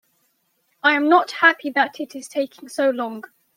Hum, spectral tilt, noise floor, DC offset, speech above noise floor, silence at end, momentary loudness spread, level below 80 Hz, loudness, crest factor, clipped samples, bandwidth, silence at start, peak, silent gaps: none; -2.5 dB/octave; -68 dBFS; under 0.1%; 48 dB; 0.35 s; 13 LU; -78 dBFS; -20 LUFS; 20 dB; under 0.1%; 16.5 kHz; 0.85 s; -2 dBFS; none